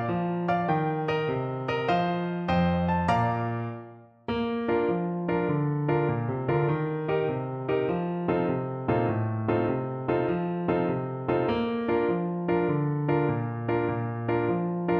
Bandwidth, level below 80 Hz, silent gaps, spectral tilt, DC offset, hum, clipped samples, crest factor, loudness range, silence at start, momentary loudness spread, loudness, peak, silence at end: 6.2 kHz; -54 dBFS; none; -9 dB/octave; under 0.1%; none; under 0.1%; 14 dB; 1 LU; 0 s; 4 LU; -27 LUFS; -12 dBFS; 0 s